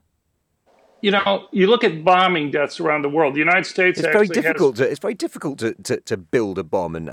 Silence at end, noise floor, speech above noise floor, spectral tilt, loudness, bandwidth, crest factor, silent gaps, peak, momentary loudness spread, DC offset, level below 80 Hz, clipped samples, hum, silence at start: 0 s; -70 dBFS; 51 dB; -5 dB/octave; -19 LUFS; 15.5 kHz; 16 dB; none; -2 dBFS; 10 LU; under 0.1%; -62 dBFS; under 0.1%; none; 1.05 s